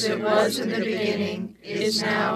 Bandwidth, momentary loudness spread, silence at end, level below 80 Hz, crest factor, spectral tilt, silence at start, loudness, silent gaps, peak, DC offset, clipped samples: 14.5 kHz; 8 LU; 0 s; -68 dBFS; 16 dB; -4 dB/octave; 0 s; -24 LUFS; none; -8 dBFS; under 0.1%; under 0.1%